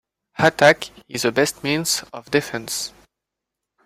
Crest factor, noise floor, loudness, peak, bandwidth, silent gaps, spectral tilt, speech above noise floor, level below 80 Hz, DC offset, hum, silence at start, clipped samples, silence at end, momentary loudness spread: 20 dB; -83 dBFS; -20 LUFS; 0 dBFS; 16 kHz; none; -3 dB/octave; 63 dB; -58 dBFS; under 0.1%; none; 0.4 s; under 0.1%; 0.95 s; 12 LU